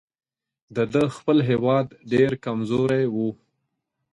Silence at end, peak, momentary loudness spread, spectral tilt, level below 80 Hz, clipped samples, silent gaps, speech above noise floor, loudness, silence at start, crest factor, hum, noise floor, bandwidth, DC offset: 0.8 s; -6 dBFS; 7 LU; -8 dB/octave; -60 dBFS; under 0.1%; none; 56 dB; -23 LUFS; 0.7 s; 16 dB; none; -78 dBFS; 11.5 kHz; under 0.1%